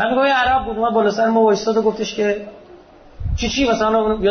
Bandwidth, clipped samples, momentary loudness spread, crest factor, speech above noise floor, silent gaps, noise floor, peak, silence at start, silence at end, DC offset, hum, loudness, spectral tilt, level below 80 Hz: 6.6 kHz; under 0.1%; 10 LU; 12 dB; 27 dB; none; -43 dBFS; -4 dBFS; 0 s; 0 s; under 0.1%; none; -17 LUFS; -5 dB/octave; -34 dBFS